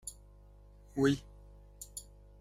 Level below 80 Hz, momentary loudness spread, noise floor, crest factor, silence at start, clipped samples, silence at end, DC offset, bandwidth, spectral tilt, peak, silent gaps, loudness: -56 dBFS; 27 LU; -57 dBFS; 22 dB; 0.05 s; under 0.1%; 0.35 s; under 0.1%; 15.5 kHz; -5.5 dB/octave; -16 dBFS; none; -35 LUFS